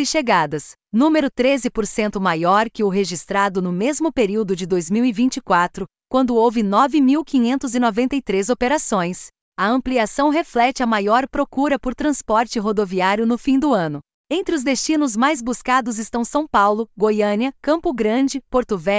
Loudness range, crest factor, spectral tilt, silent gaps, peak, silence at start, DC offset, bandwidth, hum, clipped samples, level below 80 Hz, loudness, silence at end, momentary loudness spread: 2 LU; 16 dB; -4.5 dB/octave; 9.41-9.52 s, 14.14-14.24 s; -4 dBFS; 0 s; under 0.1%; 8 kHz; none; under 0.1%; -48 dBFS; -19 LUFS; 0 s; 6 LU